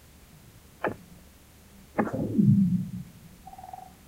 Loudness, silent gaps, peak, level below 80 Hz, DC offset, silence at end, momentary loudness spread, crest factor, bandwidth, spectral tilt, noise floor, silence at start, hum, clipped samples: -27 LUFS; none; -10 dBFS; -54 dBFS; under 0.1%; 0.3 s; 24 LU; 20 dB; 16 kHz; -9 dB/octave; -53 dBFS; 0.8 s; none; under 0.1%